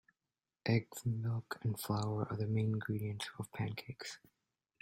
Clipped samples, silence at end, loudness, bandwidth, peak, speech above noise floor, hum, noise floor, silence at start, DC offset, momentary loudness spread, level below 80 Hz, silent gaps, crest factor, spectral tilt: under 0.1%; 0.65 s; -39 LUFS; 16 kHz; -20 dBFS; over 52 dB; none; under -90 dBFS; 0.65 s; under 0.1%; 10 LU; -70 dBFS; none; 20 dB; -6 dB/octave